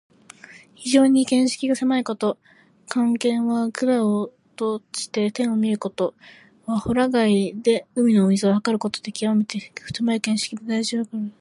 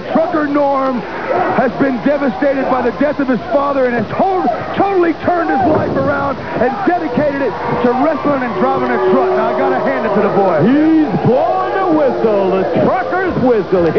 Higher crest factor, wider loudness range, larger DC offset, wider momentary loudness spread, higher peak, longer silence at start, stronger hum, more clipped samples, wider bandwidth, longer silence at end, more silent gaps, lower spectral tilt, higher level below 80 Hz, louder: first, 18 dB vs 12 dB; about the same, 3 LU vs 2 LU; second, under 0.1% vs 1%; first, 10 LU vs 4 LU; second, -4 dBFS vs 0 dBFS; first, 0.5 s vs 0 s; neither; neither; first, 11.5 kHz vs 5.4 kHz; about the same, 0.1 s vs 0 s; neither; second, -5 dB/octave vs -8.5 dB/octave; second, -58 dBFS vs -44 dBFS; second, -22 LUFS vs -14 LUFS